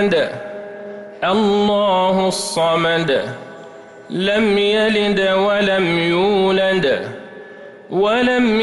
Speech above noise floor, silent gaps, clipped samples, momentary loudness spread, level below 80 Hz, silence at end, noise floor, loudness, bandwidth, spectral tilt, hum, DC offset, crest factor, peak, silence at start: 22 dB; none; under 0.1%; 17 LU; -50 dBFS; 0 s; -38 dBFS; -16 LUFS; 12 kHz; -5 dB/octave; none; under 0.1%; 10 dB; -6 dBFS; 0 s